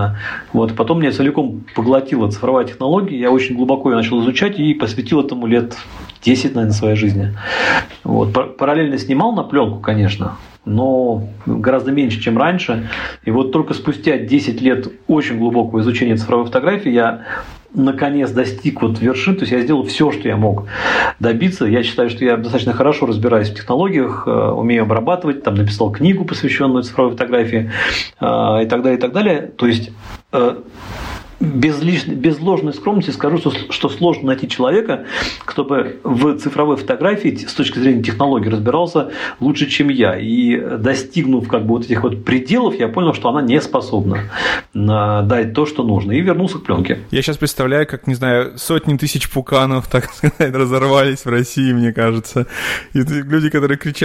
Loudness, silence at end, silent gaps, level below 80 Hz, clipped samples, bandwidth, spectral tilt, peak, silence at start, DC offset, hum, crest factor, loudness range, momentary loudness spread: -16 LUFS; 0 s; none; -44 dBFS; under 0.1%; 15.5 kHz; -6.5 dB/octave; -2 dBFS; 0 s; under 0.1%; none; 14 dB; 1 LU; 5 LU